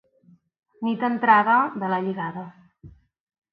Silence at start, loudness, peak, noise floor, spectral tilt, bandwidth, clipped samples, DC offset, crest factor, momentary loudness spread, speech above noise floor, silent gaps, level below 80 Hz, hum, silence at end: 0.8 s; -22 LUFS; -4 dBFS; -58 dBFS; -9.5 dB/octave; 5 kHz; under 0.1%; under 0.1%; 20 dB; 16 LU; 36 dB; none; -64 dBFS; none; 0.6 s